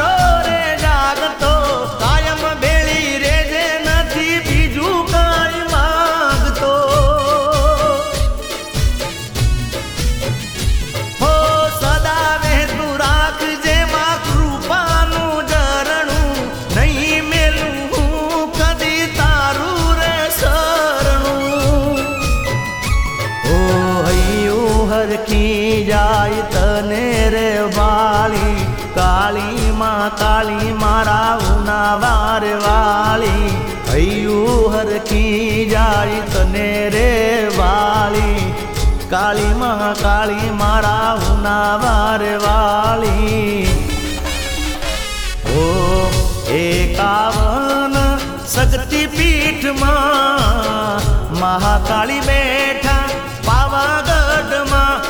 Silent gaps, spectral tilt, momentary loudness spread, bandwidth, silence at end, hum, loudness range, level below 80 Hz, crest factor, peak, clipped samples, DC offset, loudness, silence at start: none; -4.5 dB/octave; 5 LU; over 20 kHz; 0 s; none; 2 LU; -20 dBFS; 12 dB; -2 dBFS; under 0.1%; under 0.1%; -15 LUFS; 0 s